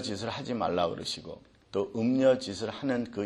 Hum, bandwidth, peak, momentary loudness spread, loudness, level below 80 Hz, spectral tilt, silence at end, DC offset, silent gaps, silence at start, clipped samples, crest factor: none; 12 kHz; -12 dBFS; 12 LU; -30 LUFS; -64 dBFS; -5.5 dB/octave; 0 s; under 0.1%; none; 0 s; under 0.1%; 18 dB